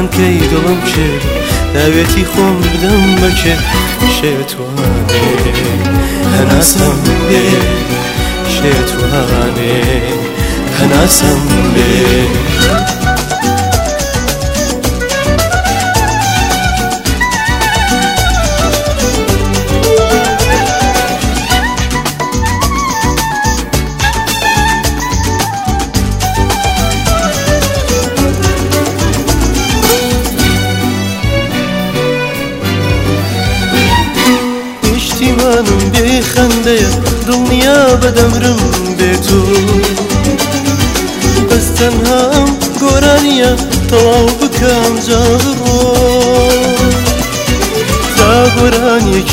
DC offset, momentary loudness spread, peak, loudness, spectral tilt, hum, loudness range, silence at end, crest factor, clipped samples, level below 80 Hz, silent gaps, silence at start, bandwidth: under 0.1%; 5 LU; 0 dBFS; -10 LUFS; -4.5 dB/octave; none; 3 LU; 0 s; 10 dB; 0.3%; -20 dBFS; none; 0 s; 16.5 kHz